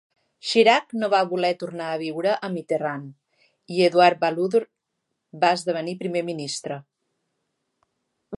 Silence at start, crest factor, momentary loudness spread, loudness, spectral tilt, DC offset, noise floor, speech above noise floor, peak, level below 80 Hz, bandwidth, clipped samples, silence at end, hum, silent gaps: 0.45 s; 20 dB; 13 LU; -22 LUFS; -4.5 dB/octave; under 0.1%; -79 dBFS; 57 dB; -4 dBFS; -78 dBFS; 11.5 kHz; under 0.1%; 0 s; none; none